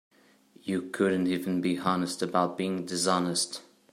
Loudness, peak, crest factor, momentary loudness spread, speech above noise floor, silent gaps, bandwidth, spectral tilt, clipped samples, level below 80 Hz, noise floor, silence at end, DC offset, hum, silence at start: -29 LUFS; -10 dBFS; 20 dB; 7 LU; 31 dB; none; 15 kHz; -4.5 dB/octave; under 0.1%; -74 dBFS; -59 dBFS; 0.3 s; under 0.1%; none; 0.65 s